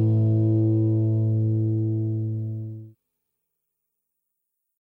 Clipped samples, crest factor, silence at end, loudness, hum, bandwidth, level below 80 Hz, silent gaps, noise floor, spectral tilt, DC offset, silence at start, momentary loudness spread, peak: under 0.1%; 12 dB; 2.05 s; -23 LUFS; none; 1.1 kHz; -68 dBFS; none; -80 dBFS; -13.5 dB/octave; under 0.1%; 0 s; 12 LU; -12 dBFS